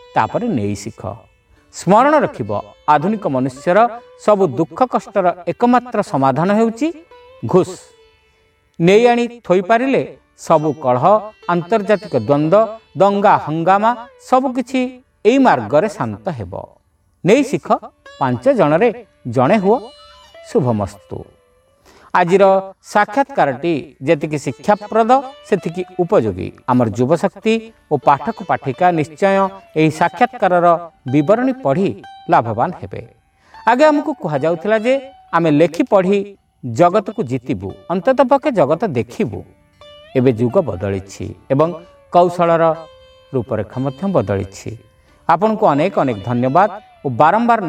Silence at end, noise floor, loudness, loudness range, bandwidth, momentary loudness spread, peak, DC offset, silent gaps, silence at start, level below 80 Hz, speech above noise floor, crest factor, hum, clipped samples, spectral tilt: 0 s; -57 dBFS; -16 LUFS; 3 LU; 14 kHz; 12 LU; 0 dBFS; under 0.1%; none; 0.15 s; -54 dBFS; 42 dB; 16 dB; none; under 0.1%; -7 dB/octave